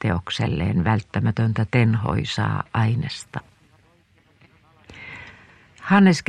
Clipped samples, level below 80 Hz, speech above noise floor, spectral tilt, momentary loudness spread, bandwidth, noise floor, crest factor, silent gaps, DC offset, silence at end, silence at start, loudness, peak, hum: under 0.1%; -46 dBFS; 38 dB; -6.5 dB/octave; 18 LU; 10 kHz; -58 dBFS; 18 dB; none; under 0.1%; 0.05 s; 0 s; -22 LUFS; -4 dBFS; none